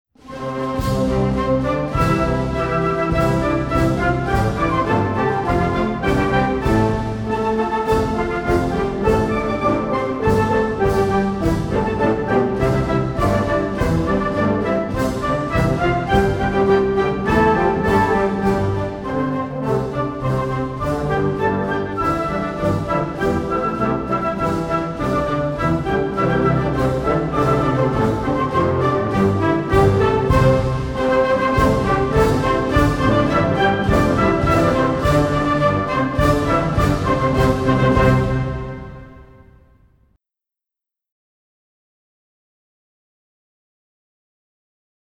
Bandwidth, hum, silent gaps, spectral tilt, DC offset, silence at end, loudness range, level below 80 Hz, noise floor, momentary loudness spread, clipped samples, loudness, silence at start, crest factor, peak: 18.5 kHz; none; none; -7.5 dB/octave; under 0.1%; 5.8 s; 4 LU; -30 dBFS; -87 dBFS; 5 LU; under 0.1%; -18 LUFS; 0.25 s; 16 dB; -2 dBFS